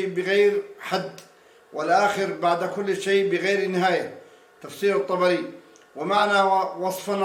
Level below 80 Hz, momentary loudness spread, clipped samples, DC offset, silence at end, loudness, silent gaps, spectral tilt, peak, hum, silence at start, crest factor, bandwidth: -76 dBFS; 11 LU; under 0.1%; under 0.1%; 0 s; -23 LUFS; none; -4.5 dB/octave; -6 dBFS; none; 0 s; 16 dB; 16.5 kHz